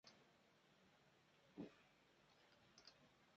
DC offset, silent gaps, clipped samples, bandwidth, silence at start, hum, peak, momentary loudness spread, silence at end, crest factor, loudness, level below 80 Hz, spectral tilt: under 0.1%; none; under 0.1%; 7.6 kHz; 0.05 s; none; -42 dBFS; 8 LU; 0 s; 24 dB; -64 LUFS; under -90 dBFS; -4 dB/octave